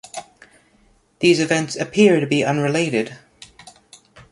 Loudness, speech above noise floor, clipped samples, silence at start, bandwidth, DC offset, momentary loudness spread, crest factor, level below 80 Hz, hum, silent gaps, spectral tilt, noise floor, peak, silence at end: -18 LUFS; 40 dB; under 0.1%; 0.15 s; 11.5 kHz; under 0.1%; 14 LU; 18 dB; -60 dBFS; none; none; -5 dB/octave; -57 dBFS; -2 dBFS; 0.1 s